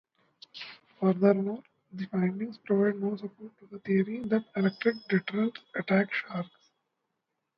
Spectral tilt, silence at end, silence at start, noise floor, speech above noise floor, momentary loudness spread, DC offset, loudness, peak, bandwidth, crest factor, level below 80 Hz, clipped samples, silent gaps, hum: -9.5 dB/octave; 1.1 s; 0.55 s; -83 dBFS; 54 dB; 18 LU; under 0.1%; -29 LUFS; -10 dBFS; 5.8 kHz; 20 dB; -74 dBFS; under 0.1%; none; none